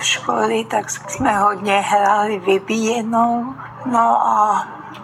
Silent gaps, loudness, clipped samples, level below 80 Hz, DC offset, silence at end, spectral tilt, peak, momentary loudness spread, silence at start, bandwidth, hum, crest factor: none; -17 LUFS; under 0.1%; -54 dBFS; under 0.1%; 0 s; -3.5 dB/octave; -2 dBFS; 8 LU; 0 s; 15 kHz; none; 16 dB